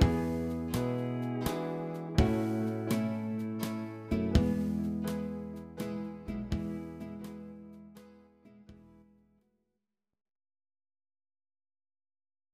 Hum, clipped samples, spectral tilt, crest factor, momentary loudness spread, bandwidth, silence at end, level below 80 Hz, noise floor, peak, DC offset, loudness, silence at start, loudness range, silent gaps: none; under 0.1%; -7 dB/octave; 24 dB; 15 LU; 15.5 kHz; 3.65 s; -44 dBFS; -88 dBFS; -10 dBFS; under 0.1%; -34 LUFS; 0 s; 15 LU; none